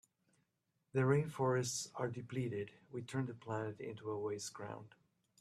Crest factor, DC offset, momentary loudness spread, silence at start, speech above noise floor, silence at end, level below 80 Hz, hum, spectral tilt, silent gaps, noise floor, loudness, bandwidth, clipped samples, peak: 20 dB; under 0.1%; 13 LU; 0.95 s; 45 dB; 0.55 s; -78 dBFS; none; -5.5 dB/octave; none; -84 dBFS; -40 LUFS; 13.5 kHz; under 0.1%; -22 dBFS